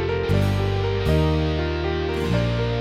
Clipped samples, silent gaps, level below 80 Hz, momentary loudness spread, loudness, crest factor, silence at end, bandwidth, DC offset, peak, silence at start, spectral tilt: under 0.1%; none; -30 dBFS; 4 LU; -22 LUFS; 14 dB; 0 s; 14.5 kHz; under 0.1%; -8 dBFS; 0 s; -7.5 dB/octave